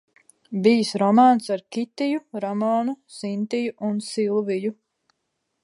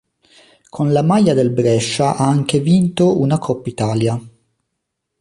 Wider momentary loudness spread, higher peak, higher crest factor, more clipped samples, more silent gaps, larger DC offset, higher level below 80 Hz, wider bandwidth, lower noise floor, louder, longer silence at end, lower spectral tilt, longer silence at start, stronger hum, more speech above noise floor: first, 13 LU vs 8 LU; about the same, -4 dBFS vs -2 dBFS; about the same, 18 dB vs 14 dB; neither; neither; neither; second, -76 dBFS vs -52 dBFS; about the same, 11.5 kHz vs 11.5 kHz; about the same, -77 dBFS vs -76 dBFS; second, -23 LUFS vs -16 LUFS; about the same, 0.9 s vs 0.9 s; about the same, -6 dB/octave vs -6.5 dB/octave; second, 0.5 s vs 0.75 s; neither; second, 55 dB vs 61 dB